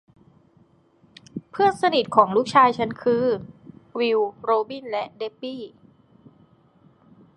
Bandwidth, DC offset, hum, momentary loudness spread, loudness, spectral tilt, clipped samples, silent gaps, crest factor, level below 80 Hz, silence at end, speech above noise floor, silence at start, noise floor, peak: 11.5 kHz; under 0.1%; none; 19 LU; -22 LUFS; -5.5 dB/octave; under 0.1%; none; 24 dB; -66 dBFS; 1.7 s; 37 dB; 1.35 s; -59 dBFS; 0 dBFS